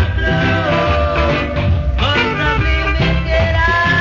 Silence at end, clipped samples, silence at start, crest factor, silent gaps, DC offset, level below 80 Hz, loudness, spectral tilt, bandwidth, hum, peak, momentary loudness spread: 0 s; under 0.1%; 0 s; 12 dB; none; under 0.1%; -20 dBFS; -15 LUFS; -6.5 dB/octave; 7.4 kHz; none; -2 dBFS; 3 LU